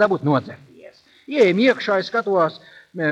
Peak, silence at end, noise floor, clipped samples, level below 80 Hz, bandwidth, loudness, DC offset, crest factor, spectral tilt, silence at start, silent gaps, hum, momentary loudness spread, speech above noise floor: -4 dBFS; 0 s; -47 dBFS; under 0.1%; -68 dBFS; 9.2 kHz; -19 LUFS; under 0.1%; 16 dB; -6.5 dB/octave; 0 s; none; none; 11 LU; 28 dB